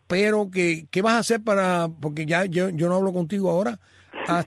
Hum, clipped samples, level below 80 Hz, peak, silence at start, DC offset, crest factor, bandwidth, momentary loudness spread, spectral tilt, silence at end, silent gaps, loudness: none; under 0.1%; -64 dBFS; -8 dBFS; 0.1 s; under 0.1%; 16 dB; 13.5 kHz; 8 LU; -5.5 dB/octave; 0 s; none; -23 LUFS